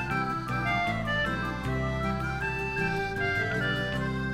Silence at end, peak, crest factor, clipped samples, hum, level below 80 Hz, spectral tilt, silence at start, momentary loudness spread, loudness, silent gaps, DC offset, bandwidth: 0 s; -16 dBFS; 14 dB; under 0.1%; none; -42 dBFS; -6 dB/octave; 0 s; 3 LU; -29 LUFS; none; under 0.1%; 15 kHz